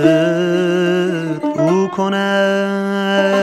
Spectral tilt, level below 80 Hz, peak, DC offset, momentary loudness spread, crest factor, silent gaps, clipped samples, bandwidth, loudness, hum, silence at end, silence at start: -6 dB/octave; -62 dBFS; 0 dBFS; under 0.1%; 4 LU; 14 dB; none; under 0.1%; 13.5 kHz; -16 LUFS; none; 0 s; 0 s